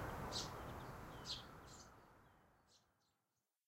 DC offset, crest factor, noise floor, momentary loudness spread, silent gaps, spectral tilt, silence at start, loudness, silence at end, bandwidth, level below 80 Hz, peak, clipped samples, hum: under 0.1%; 20 dB; under -90 dBFS; 20 LU; none; -3.5 dB/octave; 0 s; -50 LUFS; 0.9 s; 16 kHz; -64 dBFS; -32 dBFS; under 0.1%; none